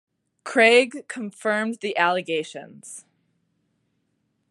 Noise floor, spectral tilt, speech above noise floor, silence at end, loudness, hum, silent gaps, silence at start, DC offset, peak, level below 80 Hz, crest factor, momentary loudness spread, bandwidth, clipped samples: -72 dBFS; -3 dB/octave; 50 dB; 1.5 s; -21 LUFS; none; none; 0.45 s; under 0.1%; -4 dBFS; -86 dBFS; 20 dB; 24 LU; 11.5 kHz; under 0.1%